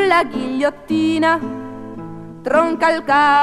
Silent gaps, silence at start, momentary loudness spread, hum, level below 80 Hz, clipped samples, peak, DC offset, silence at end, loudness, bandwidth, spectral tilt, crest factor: none; 0 s; 17 LU; none; -50 dBFS; under 0.1%; 0 dBFS; 0.2%; 0 s; -17 LUFS; 12 kHz; -5 dB/octave; 16 dB